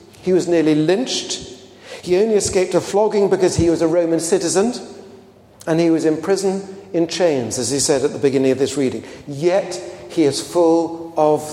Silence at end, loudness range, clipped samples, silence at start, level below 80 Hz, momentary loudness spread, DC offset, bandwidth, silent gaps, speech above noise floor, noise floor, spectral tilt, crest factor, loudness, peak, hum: 0 s; 2 LU; under 0.1%; 0.2 s; -50 dBFS; 11 LU; under 0.1%; 15.5 kHz; none; 27 dB; -44 dBFS; -4.5 dB/octave; 16 dB; -18 LUFS; -2 dBFS; none